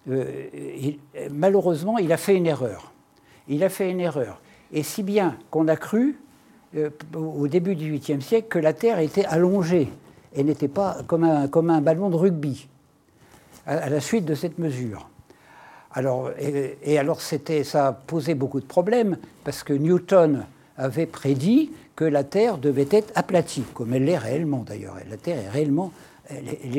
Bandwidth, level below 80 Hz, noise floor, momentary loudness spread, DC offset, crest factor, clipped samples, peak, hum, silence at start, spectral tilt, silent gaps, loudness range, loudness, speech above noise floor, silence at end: 17 kHz; -64 dBFS; -58 dBFS; 13 LU; under 0.1%; 18 dB; under 0.1%; -4 dBFS; none; 0.05 s; -7 dB/octave; none; 5 LU; -23 LUFS; 35 dB; 0 s